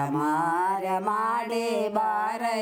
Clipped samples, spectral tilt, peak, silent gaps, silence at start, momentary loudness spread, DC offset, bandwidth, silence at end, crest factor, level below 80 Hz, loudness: under 0.1%; -5 dB/octave; -12 dBFS; none; 0 s; 2 LU; under 0.1%; over 20 kHz; 0 s; 14 dB; -72 dBFS; -26 LUFS